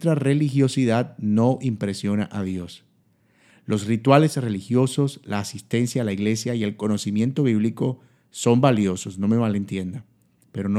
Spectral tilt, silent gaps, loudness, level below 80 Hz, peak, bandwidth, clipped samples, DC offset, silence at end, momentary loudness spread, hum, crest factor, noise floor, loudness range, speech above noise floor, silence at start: -6.5 dB/octave; none; -22 LUFS; -66 dBFS; 0 dBFS; 14 kHz; under 0.1%; under 0.1%; 0 s; 12 LU; none; 22 dB; -62 dBFS; 2 LU; 41 dB; 0 s